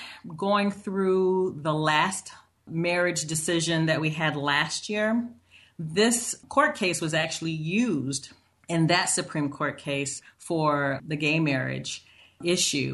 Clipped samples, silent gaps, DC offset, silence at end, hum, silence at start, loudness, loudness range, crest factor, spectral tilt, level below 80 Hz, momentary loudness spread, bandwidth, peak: under 0.1%; none; under 0.1%; 0 s; none; 0 s; -26 LUFS; 2 LU; 18 dB; -4 dB/octave; -66 dBFS; 10 LU; 12.5 kHz; -8 dBFS